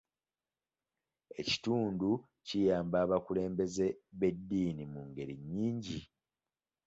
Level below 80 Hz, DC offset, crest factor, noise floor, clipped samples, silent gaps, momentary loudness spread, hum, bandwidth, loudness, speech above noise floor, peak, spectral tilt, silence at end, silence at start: -64 dBFS; under 0.1%; 18 dB; under -90 dBFS; under 0.1%; none; 12 LU; none; 8 kHz; -35 LUFS; over 56 dB; -18 dBFS; -6 dB/octave; 0.85 s; 1.3 s